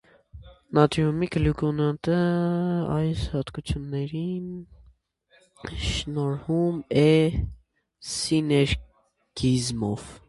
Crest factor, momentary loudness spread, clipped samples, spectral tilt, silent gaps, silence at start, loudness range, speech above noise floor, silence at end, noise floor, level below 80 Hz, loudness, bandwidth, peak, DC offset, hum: 22 dB; 11 LU; under 0.1%; -6 dB/octave; none; 0.35 s; 6 LU; 39 dB; 0.1 s; -63 dBFS; -40 dBFS; -25 LUFS; 11.5 kHz; -4 dBFS; under 0.1%; none